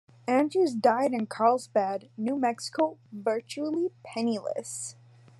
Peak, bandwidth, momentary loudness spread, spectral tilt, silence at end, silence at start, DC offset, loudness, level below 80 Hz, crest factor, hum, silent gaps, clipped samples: -10 dBFS; 12.5 kHz; 10 LU; -4.5 dB/octave; 0.5 s; 0.25 s; under 0.1%; -28 LUFS; -84 dBFS; 18 dB; none; none; under 0.1%